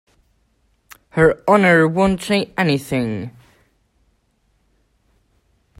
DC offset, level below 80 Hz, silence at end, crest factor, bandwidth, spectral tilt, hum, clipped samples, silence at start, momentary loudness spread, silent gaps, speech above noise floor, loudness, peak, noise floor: under 0.1%; -46 dBFS; 2.5 s; 20 dB; 16 kHz; -6 dB/octave; none; under 0.1%; 1.15 s; 13 LU; none; 47 dB; -17 LUFS; 0 dBFS; -63 dBFS